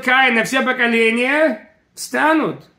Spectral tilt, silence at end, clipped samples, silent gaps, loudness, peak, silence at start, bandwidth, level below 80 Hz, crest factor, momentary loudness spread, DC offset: -3.5 dB/octave; 0.2 s; under 0.1%; none; -15 LUFS; 0 dBFS; 0 s; 16 kHz; -68 dBFS; 16 dB; 10 LU; under 0.1%